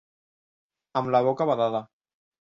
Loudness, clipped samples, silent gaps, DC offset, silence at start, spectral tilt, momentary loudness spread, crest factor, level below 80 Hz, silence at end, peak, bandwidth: -25 LUFS; under 0.1%; none; under 0.1%; 0.95 s; -8 dB/octave; 9 LU; 18 dB; -70 dBFS; 0.55 s; -10 dBFS; 7.4 kHz